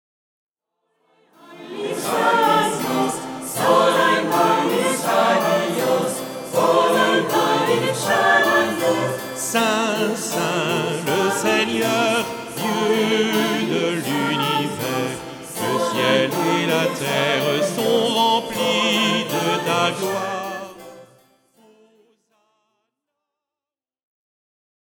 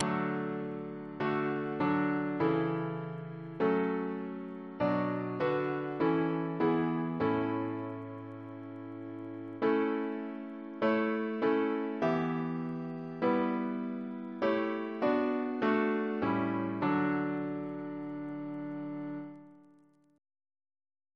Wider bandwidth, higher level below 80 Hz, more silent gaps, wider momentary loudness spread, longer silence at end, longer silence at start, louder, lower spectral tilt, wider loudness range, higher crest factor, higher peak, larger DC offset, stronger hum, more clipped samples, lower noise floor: first, over 20 kHz vs 6 kHz; first, -64 dBFS vs -72 dBFS; neither; second, 9 LU vs 13 LU; first, 3.95 s vs 1.55 s; first, 1.5 s vs 0 s; first, -19 LUFS vs -33 LUFS; second, -3.5 dB/octave vs -8.5 dB/octave; about the same, 4 LU vs 4 LU; about the same, 18 dB vs 22 dB; first, -4 dBFS vs -10 dBFS; neither; neither; neither; first, under -90 dBFS vs -64 dBFS